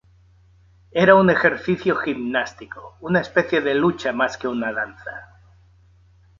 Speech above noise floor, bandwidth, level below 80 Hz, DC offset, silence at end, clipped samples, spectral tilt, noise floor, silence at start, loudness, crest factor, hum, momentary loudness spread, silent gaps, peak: 34 dB; 7.4 kHz; -54 dBFS; under 0.1%; 1.15 s; under 0.1%; -6.5 dB/octave; -54 dBFS; 0.95 s; -20 LUFS; 20 dB; none; 21 LU; none; -2 dBFS